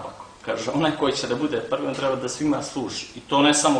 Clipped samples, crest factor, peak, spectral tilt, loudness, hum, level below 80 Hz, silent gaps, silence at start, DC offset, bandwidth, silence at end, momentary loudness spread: under 0.1%; 18 dB; -6 dBFS; -3.5 dB/octave; -24 LUFS; none; -56 dBFS; none; 0 s; under 0.1%; 10.5 kHz; 0 s; 11 LU